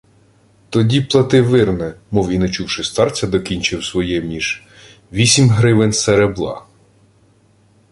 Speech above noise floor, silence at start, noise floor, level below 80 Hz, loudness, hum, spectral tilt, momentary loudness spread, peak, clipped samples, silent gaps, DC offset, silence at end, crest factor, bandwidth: 38 dB; 0.7 s; -53 dBFS; -40 dBFS; -16 LUFS; none; -5 dB/octave; 10 LU; 0 dBFS; under 0.1%; none; under 0.1%; 1.3 s; 16 dB; 11.5 kHz